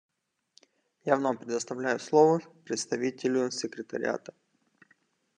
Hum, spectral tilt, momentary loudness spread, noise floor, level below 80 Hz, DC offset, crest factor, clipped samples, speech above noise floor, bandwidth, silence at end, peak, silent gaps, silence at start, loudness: none; -4.5 dB/octave; 13 LU; -69 dBFS; -82 dBFS; under 0.1%; 22 dB; under 0.1%; 41 dB; 10.5 kHz; 1.2 s; -8 dBFS; none; 1.05 s; -29 LUFS